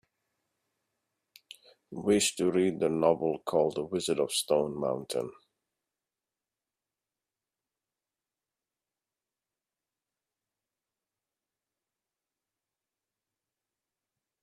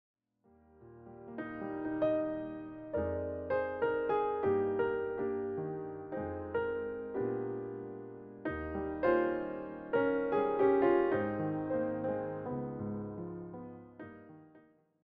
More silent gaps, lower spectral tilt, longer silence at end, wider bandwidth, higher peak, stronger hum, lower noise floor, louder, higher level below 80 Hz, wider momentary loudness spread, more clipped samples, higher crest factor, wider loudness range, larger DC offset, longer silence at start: neither; second, -4 dB/octave vs -6.5 dB/octave; first, 9.1 s vs 0.45 s; first, 14.5 kHz vs 4.9 kHz; first, -10 dBFS vs -18 dBFS; neither; first, under -90 dBFS vs -68 dBFS; first, -29 LUFS vs -35 LUFS; second, -72 dBFS vs -62 dBFS; second, 9 LU vs 16 LU; neither; first, 26 dB vs 18 dB; first, 11 LU vs 7 LU; neither; first, 1.9 s vs 0.8 s